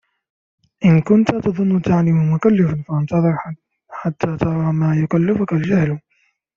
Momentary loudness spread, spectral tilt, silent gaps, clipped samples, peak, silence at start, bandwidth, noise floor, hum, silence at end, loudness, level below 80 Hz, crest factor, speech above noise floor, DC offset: 11 LU; -9 dB/octave; none; under 0.1%; -2 dBFS; 0.8 s; 7 kHz; -64 dBFS; none; 0.6 s; -17 LUFS; -50 dBFS; 16 dB; 48 dB; under 0.1%